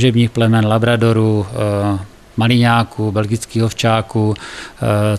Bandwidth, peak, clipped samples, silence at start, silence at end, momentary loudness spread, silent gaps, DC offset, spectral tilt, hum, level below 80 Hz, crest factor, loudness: 13 kHz; 0 dBFS; under 0.1%; 0 s; 0 s; 8 LU; none; under 0.1%; -6.5 dB/octave; none; -44 dBFS; 14 dB; -15 LUFS